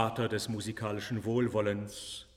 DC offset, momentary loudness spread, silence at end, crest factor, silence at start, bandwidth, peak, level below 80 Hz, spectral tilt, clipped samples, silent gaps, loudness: under 0.1%; 7 LU; 0.1 s; 20 dB; 0 s; 15.5 kHz; -12 dBFS; -62 dBFS; -5.5 dB/octave; under 0.1%; none; -34 LUFS